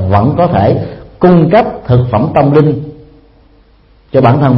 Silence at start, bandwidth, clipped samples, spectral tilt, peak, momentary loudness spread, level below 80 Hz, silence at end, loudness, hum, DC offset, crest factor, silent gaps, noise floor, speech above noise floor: 0 s; 5.6 kHz; 0.2%; -11 dB/octave; 0 dBFS; 9 LU; -36 dBFS; 0 s; -10 LUFS; none; under 0.1%; 10 dB; none; -45 dBFS; 37 dB